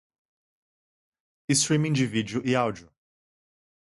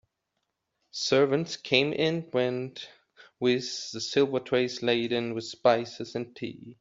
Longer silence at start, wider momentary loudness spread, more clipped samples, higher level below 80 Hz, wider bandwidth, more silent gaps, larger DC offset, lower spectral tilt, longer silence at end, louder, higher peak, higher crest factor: first, 1.5 s vs 0.95 s; about the same, 13 LU vs 14 LU; neither; first, -64 dBFS vs -70 dBFS; first, 11.5 kHz vs 7.8 kHz; neither; neither; about the same, -4.5 dB/octave vs -4.5 dB/octave; first, 1.15 s vs 0.1 s; about the same, -25 LUFS vs -27 LUFS; second, -10 dBFS vs -6 dBFS; about the same, 20 dB vs 22 dB